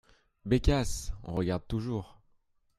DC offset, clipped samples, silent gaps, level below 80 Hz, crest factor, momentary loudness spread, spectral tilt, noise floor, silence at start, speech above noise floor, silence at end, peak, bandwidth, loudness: under 0.1%; under 0.1%; none; -38 dBFS; 20 dB; 13 LU; -6 dB/octave; -69 dBFS; 0.45 s; 39 dB; 0.7 s; -12 dBFS; 14 kHz; -32 LUFS